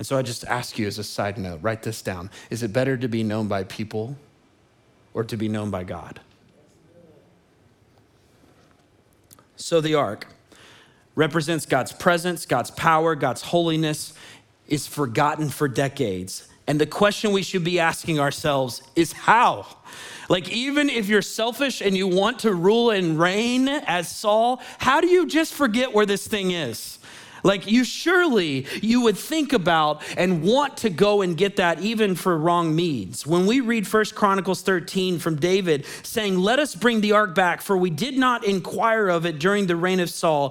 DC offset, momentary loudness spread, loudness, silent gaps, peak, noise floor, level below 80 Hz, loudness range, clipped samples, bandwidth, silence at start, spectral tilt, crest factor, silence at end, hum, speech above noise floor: under 0.1%; 11 LU; -22 LUFS; none; -2 dBFS; -59 dBFS; -58 dBFS; 8 LU; under 0.1%; 19 kHz; 0 s; -5 dB/octave; 20 dB; 0 s; none; 37 dB